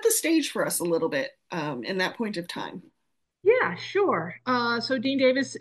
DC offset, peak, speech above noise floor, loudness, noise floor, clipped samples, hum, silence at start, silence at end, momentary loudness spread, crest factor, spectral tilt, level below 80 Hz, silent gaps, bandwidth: under 0.1%; -10 dBFS; 53 dB; -26 LUFS; -79 dBFS; under 0.1%; none; 0 s; 0 s; 10 LU; 16 dB; -3.5 dB/octave; -78 dBFS; none; 12.5 kHz